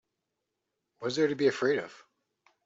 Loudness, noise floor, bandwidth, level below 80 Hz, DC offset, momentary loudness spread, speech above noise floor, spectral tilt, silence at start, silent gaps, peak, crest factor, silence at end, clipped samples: -29 LUFS; -84 dBFS; 8 kHz; -76 dBFS; under 0.1%; 11 LU; 56 dB; -5 dB/octave; 1 s; none; -14 dBFS; 18 dB; 0.7 s; under 0.1%